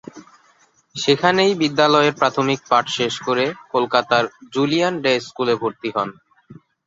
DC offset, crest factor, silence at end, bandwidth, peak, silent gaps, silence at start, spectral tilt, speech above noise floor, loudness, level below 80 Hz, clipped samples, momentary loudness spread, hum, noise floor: under 0.1%; 18 dB; 0.35 s; 7.8 kHz; -2 dBFS; none; 0.15 s; -4.5 dB/octave; 39 dB; -19 LUFS; -62 dBFS; under 0.1%; 9 LU; none; -57 dBFS